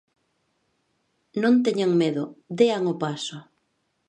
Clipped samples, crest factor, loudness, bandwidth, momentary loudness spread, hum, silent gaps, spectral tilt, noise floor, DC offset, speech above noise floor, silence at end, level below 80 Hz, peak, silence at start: under 0.1%; 20 dB; -23 LUFS; 9.8 kHz; 14 LU; none; none; -6 dB/octave; -73 dBFS; under 0.1%; 50 dB; 0.65 s; -74 dBFS; -6 dBFS; 1.35 s